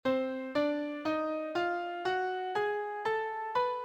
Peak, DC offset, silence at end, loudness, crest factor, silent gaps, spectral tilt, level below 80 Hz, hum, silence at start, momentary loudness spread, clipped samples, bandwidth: -18 dBFS; under 0.1%; 0 s; -33 LUFS; 14 dB; none; -5 dB/octave; -72 dBFS; none; 0.05 s; 2 LU; under 0.1%; 17.5 kHz